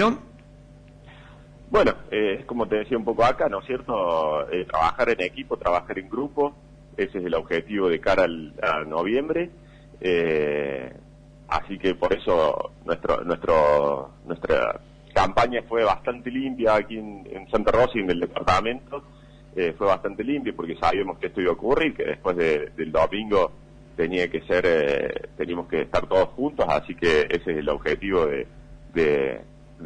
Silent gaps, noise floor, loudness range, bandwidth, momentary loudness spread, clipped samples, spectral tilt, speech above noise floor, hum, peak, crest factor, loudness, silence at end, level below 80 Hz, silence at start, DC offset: none; -47 dBFS; 2 LU; 9.8 kHz; 9 LU; under 0.1%; -6 dB/octave; 24 dB; none; -8 dBFS; 16 dB; -24 LUFS; 0 s; -44 dBFS; 0 s; under 0.1%